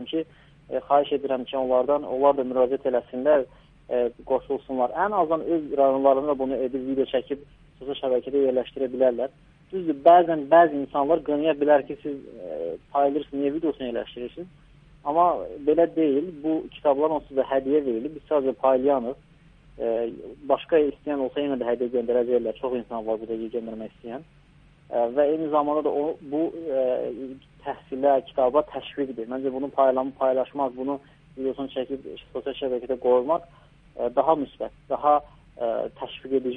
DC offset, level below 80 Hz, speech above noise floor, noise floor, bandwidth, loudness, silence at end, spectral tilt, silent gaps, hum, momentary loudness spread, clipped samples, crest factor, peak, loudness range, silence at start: under 0.1%; -58 dBFS; 31 dB; -55 dBFS; 3.9 kHz; -24 LUFS; 0 s; -8.5 dB/octave; none; none; 13 LU; under 0.1%; 20 dB; -4 dBFS; 6 LU; 0 s